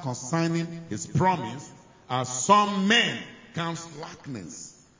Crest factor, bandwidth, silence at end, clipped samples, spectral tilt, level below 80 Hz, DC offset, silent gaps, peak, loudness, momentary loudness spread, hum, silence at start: 22 dB; 7.8 kHz; 0.3 s; under 0.1%; -4 dB/octave; -60 dBFS; under 0.1%; none; -4 dBFS; -25 LUFS; 19 LU; none; 0 s